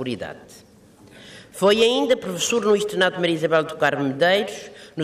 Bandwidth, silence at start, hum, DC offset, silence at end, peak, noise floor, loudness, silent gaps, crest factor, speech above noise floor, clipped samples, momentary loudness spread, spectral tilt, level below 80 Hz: 15.5 kHz; 0 s; none; under 0.1%; 0 s; -6 dBFS; -49 dBFS; -20 LUFS; none; 16 dB; 28 dB; under 0.1%; 15 LU; -3.5 dB/octave; -62 dBFS